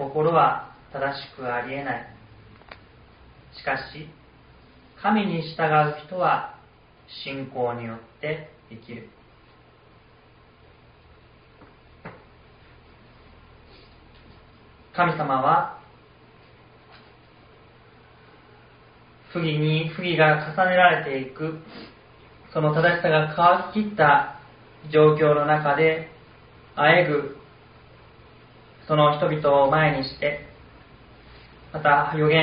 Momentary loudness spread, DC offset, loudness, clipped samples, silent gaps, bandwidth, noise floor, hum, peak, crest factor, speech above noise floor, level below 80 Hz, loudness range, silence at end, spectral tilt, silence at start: 21 LU; under 0.1%; -22 LUFS; under 0.1%; none; 5.2 kHz; -53 dBFS; none; -4 dBFS; 22 dB; 32 dB; -58 dBFS; 13 LU; 0 s; -4 dB/octave; 0 s